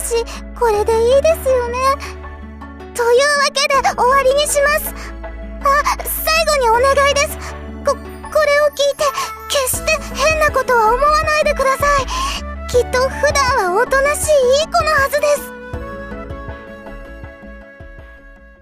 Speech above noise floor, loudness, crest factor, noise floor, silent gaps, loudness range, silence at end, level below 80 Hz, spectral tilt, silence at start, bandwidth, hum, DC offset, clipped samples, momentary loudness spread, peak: 25 dB; -15 LUFS; 12 dB; -40 dBFS; none; 3 LU; 0.15 s; -32 dBFS; -2.5 dB/octave; 0 s; 15.5 kHz; none; under 0.1%; under 0.1%; 17 LU; -4 dBFS